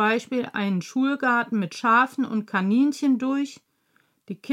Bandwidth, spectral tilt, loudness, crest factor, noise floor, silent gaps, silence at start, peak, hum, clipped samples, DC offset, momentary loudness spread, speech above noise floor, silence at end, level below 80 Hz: 12.5 kHz; -5.5 dB/octave; -23 LUFS; 16 dB; -67 dBFS; none; 0 s; -8 dBFS; none; under 0.1%; under 0.1%; 8 LU; 44 dB; 0 s; -82 dBFS